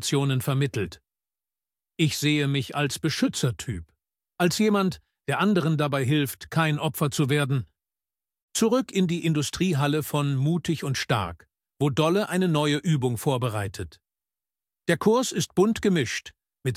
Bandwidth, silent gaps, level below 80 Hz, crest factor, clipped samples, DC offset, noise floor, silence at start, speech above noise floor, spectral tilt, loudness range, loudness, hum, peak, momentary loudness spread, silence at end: 16 kHz; 8.42-8.48 s; -56 dBFS; 18 dB; under 0.1%; under 0.1%; under -90 dBFS; 0 s; over 66 dB; -5.5 dB/octave; 2 LU; -25 LUFS; none; -6 dBFS; 10 LU; 0 s